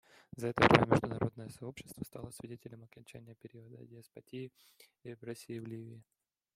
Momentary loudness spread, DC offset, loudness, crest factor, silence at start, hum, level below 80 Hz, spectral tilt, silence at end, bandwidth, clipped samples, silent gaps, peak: 27 LU; under 0.1%; -32 LUFS; 30 dB; 0.35 s; none; -62 dBFS; -6 dB/octave; 0.55 s; 16 kHz; under 0.1%; none; -6 dBFS